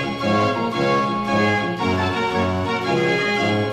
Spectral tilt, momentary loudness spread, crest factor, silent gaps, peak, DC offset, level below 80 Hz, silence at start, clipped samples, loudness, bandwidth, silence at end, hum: -6 dB/octave; 2 LU; 14 dB; none; -6 dBFS; under 0.1%; -52 dBFS; 0 s; under 0.1%; -20 LUFS; 14 kHz; 0 s; none